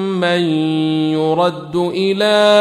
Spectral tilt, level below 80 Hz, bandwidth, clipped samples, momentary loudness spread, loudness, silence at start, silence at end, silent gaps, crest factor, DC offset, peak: -6 dB/octave; -58 dBFS; 13.5 kHz; under 0.1%; 5 LU; -15 LUFS; 0 s; 0 s; none; 14 dB; under 0.1%; -2 dBFS